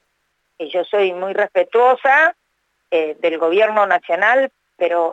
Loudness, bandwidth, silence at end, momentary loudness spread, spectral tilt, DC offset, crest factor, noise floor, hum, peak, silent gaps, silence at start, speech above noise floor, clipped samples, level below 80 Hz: -16 LUFS; 7.8 kHz; 0 s; 10 LU; -4.5 dB/octave; under 0.1%; 16 dB; -69 dBFS; none; -2 dBFS; none; 0.6 s; 53 dB; under 0.1%; -82 dBFS